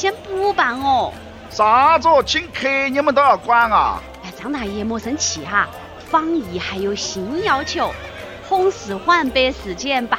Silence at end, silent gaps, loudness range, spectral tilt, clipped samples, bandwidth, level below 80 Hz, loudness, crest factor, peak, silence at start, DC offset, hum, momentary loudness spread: 0 s; none; 6 LU; -3 dB/octave; under 0.1%; 16.5 kHz; -42 dBFS; -18 LUFS; 16 dB; -2 dBFS; 0 s; under 0.1%; none; 13 LU